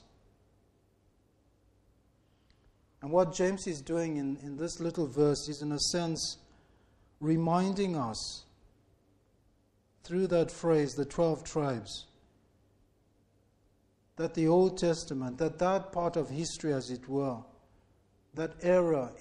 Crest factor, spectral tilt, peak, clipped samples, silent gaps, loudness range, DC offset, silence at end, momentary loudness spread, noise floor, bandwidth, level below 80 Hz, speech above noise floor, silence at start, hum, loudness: 20 dB; -5.5 dB/octave; -14 dBFS; under 0.1%; none; 4 LU; under 0.1%; 0 s; 11 LU; -69 dBFS; 12 kHz; -60 dBFS; 38 dB; 3 s; none; -32 LUFS